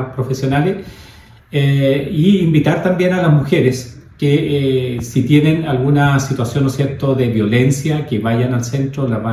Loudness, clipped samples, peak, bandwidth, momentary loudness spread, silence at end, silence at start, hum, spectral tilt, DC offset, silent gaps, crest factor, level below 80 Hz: -15 LUFS; under 0.1%; 0 dBFS; 14 kHz; 7 LU; 0 s; 0 s; none; -7 dB/octave; under 0.1%; none; 14 dB; -44 dBFS